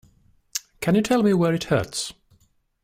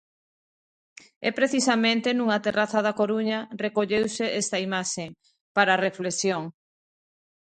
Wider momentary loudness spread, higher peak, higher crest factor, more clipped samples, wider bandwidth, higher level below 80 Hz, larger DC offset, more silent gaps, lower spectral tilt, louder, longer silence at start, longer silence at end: first, 13 LU vs 8 LU; about the same, -6 dBFS vs -4 dBFS; about the same, 18 dB vs 22 dB; neither; first, 16 kHz vs 9.4 kHz; first, -54 dBFS vs -68 dBFS; neither; second, none vs 5.41-5.55 s; first, -5.5 dB/octave vs -3.5 dB/octave; about the same, -23 LUFS vs -25 LUFS; second, 0.55 s vs 1.2 s; second, 0.7 s vs 0.95 s